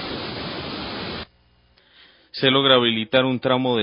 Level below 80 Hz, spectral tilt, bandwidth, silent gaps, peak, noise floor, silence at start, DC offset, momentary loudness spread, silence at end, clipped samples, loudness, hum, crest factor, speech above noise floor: -52 dBFS; -9.5 dB/octave; 5.4 kHz; none; -2 dBFS; -59 dBFS; 0 s; under 0.1%; 17 LU; 0 s; under 0.1%; -20 LUFS; none; 20 dB; 40 dB